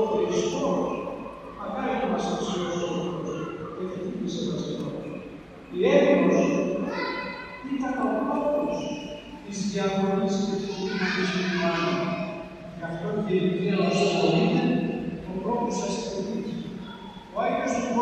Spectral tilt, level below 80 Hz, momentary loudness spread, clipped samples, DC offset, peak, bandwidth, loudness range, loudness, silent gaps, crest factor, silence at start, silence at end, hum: -5.5 dB/octave; -56 dBFS; 15 LU; under 0.1%; under 0.1%; -6 dBFS; 9 kHz; 5 LU; -27 LUFS; none; 20 dB; 0 s; 0 s; none